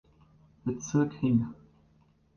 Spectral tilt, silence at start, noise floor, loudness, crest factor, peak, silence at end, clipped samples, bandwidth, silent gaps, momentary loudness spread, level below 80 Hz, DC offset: -7 dB/octave; 0.65 s; -65 dBFS; -30 LUFS; 18 dB; -14 dBFS; 0.85 s; under 0.1%; 7 kHz; none; 11 LU; -60 dBFS; under 0.1%